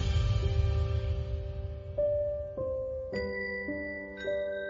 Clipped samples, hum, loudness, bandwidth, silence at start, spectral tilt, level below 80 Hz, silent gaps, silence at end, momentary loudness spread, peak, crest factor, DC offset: under 0.1%; none; -33 LUFS; 7.4 kHz; 0 s; -7 dB/octave; -36 dBFS; none; 0 s; 8 LU; -18 dBFS; 14 dB; under 0.1%